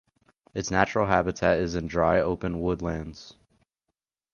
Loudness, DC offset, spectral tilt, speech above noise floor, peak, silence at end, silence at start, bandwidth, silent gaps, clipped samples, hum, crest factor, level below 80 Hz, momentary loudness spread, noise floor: -26 LUFS; under 0.1%; -6 dB/octave; 58 dB; -4 dBFS; 1 s; 0.55 s; 7.2 kHz; none; under 0.1%; none; 22 dB; -46 dBFS; 13 LU; -84 dBFS